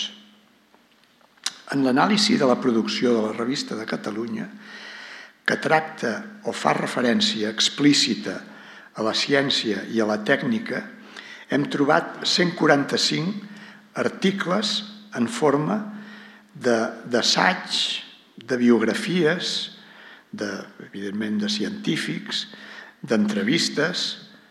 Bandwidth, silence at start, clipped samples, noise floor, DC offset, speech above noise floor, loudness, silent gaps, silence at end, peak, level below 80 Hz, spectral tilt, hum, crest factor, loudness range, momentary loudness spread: 13.5 kHz; 0 s; under 0.1%; -58 dBFS; under 0.1%; 35 dB; -22 LUFS; none; 0.25 s; -2 dBFS; -78 dBFS; -4 dB/octave; none; 22 dB; 5 LU; 18 LU